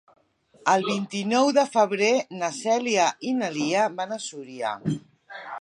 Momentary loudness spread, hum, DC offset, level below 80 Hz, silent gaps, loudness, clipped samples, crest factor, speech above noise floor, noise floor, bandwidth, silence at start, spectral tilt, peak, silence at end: 13 LU; none; under 0.1%; -70 dBFS; none; -24 LUFS; under 0.1%; 18 dB; 34 dB; -58 dBFS; 11.5 kHz; 0.65 s; -4 dB/octave; -6 dBFS; 0 s